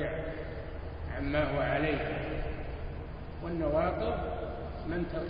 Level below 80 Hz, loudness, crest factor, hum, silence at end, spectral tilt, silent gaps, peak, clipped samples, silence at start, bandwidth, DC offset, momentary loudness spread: -42 dBFS; -34 LUFS; 18 dB; none; 0 s; -5.5 dB/octave; none; -14 dBFS; under 0.1%; 0 s; 5.2 kHz; under 0.1%; 12 LU